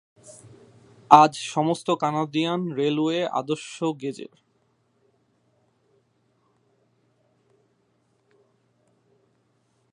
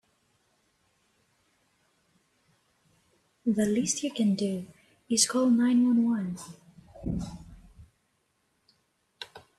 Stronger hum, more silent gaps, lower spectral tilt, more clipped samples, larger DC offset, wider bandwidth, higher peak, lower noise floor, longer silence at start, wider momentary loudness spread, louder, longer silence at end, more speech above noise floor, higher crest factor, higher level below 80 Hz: first, 60 Hz at -60 dBFS vs none; neither; first, -5.5 dB/octave vs -4 dB/octave; neither; neither; second, 11.5 kHz vs 13 kHz; first, 0 dBFS vs -8 dBFS; second, -68 dBFS vs -74 dBFS; second, 0.3 s vs 3.45 s; second, 18 LU vs 22 LU; first, -22 LUFS vs -27 LUFS; first, 5.7 s vs 0.2 s; about the same, 46 dB vs 48 dB; about the same, 26 dB vs 24 dB; second, -76 dBFS vs -56 dBFS